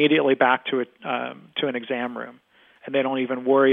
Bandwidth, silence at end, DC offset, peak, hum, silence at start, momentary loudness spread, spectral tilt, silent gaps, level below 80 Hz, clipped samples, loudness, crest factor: 3.9 kHz; 0 s; under 0.1%; -4 dBFS; none; 0 s; 12 LU; -8 dB/octave; none; -78 dBFS; under 0.1%; -23 LUFS; 18 dB